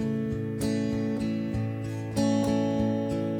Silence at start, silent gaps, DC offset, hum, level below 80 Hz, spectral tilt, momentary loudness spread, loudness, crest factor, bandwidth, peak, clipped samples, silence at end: 0 s; none; under 0.1%; none; -50 dBFS; -7 dB/octave; 6 LU; -28 LUFS; 14 dB; 16 kHz; -14 dBFS; under 0.1%; 0 s